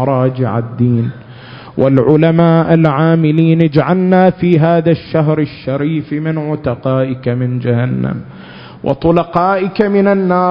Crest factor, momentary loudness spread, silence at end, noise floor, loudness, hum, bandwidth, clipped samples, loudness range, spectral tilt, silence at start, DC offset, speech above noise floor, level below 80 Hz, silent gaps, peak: 12 dB; 11 LU; 0 s; -33 dBFS; -13 LUFS; none; 5.4 kHz; 0.1%; 6 LU; -11 dB/octave; 0 s; under 0.1%; 21 dB; -44 dBFS; none; 0 dBFS